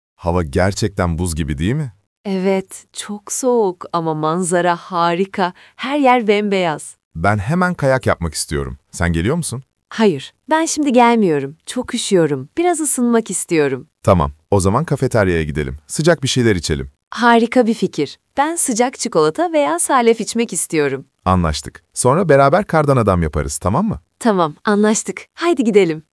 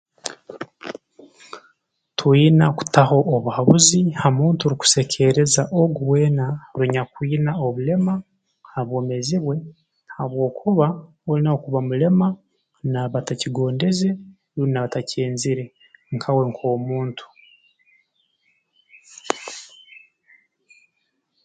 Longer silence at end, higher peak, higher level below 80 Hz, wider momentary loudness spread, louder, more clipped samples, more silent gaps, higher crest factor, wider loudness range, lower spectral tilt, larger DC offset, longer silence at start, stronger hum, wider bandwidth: second, 0.15 s vs 1.45 s; about the same, 0 dBFS vs 0 dBFS; first, -38 dBFS vs -58 dBFS; second, 10 LU vs 18 LU; first, -17 LUFS vs -20 LUFS; neither; first, 2.07-2.24 s, 7.05-7.11 s, 17.07-17.11 s vs none; about the same, 16 dB vs 20 dB; second, 3 LU vs 13 LU; about the same, -5 dB/octave vs -5 dB/octave; neither; about the same, 0.2 s vs 0.25 s; neither; first, 12 kHz vs 9.4 kHz